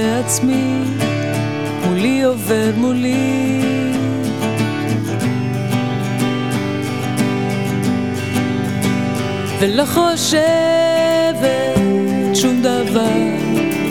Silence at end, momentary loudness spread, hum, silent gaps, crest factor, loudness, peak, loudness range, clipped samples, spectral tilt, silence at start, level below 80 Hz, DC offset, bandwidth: 0 s; 6 LU; none; none; 16 dB; -17 LUFS; 0 dBFS; 4 LU; under 0.1%; -5 dB/octave; 0 s; -50 dBFS; 0.7%; 18 kHz